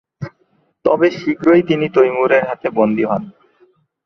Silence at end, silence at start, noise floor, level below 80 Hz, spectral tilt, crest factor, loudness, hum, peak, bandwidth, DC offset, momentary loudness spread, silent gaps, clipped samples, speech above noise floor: 0.75 s; 0.2 s; -60 dBFS; -58 dBFS; -7.5 dB/octave; 16 dB; -15 LUFS; none; 0 dBFS; 6.4 kHz; under 0.1%; 11 LU; none; under 0.1%; 46 dB